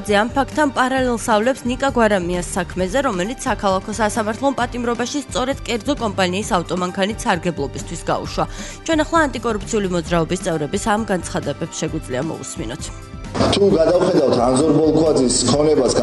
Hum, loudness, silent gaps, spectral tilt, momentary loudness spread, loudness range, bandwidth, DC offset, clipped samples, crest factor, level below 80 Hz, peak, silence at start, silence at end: none; -19 LUFS; none; -4.5 dB/octave; 10 LU; 5 LU; 11.5 kHz; under 0.1%; under 0.1%; 16 dB; -36 dBFS; -2 dBFS; 0 s; 0 s